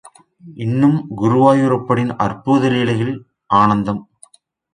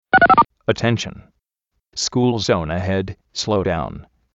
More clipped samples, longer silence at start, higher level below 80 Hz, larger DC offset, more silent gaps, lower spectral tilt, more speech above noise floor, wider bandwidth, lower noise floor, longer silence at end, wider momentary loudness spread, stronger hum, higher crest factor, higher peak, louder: neither; first, 0.45 s vs 0.15 s; second, -52 dBFS vs -44 dBFS; neither; neither; first, -7.5 dB/octave vs -4.5 dB/octave; second, 34 dB vs 55 dB; first, 10.5 kHz vs 8.2 kHz; second, -49 dBFS vs -75 dBFS; first, 0.7 s vs 0.35 s; second, 11 LU vs 17 LU; neither; about the same, 16 dB vs 18 dB; about the same, 0 dBFS vs 0 dBFS; about the same, -16 LUFS vs -18 LUFS